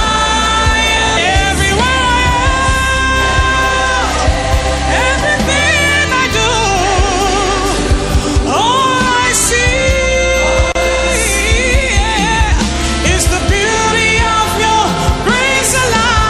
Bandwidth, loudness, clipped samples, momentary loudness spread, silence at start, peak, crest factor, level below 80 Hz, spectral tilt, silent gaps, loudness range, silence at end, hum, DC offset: 15 kHz; -11 LUFS; under 0.1%; 3 LU; 0 s; 0 dBFS; 12 dB; -18 dBFS; -3 dB/octave; none; 1 LU; 0 s; none; under 0.1%